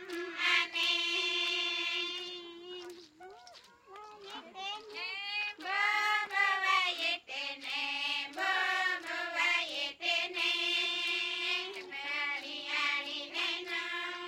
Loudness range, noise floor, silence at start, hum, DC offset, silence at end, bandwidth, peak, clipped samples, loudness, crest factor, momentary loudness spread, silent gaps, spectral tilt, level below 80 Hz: 9 LU; -57 dBFS; 0 s; none; under 0.1%; 0 s; 16.5 kHz; -14 dBFS; under 0.1%; -32 LUFS; 20 dB; 16 LU; none; 0.5 dB/octave; -84 dBFS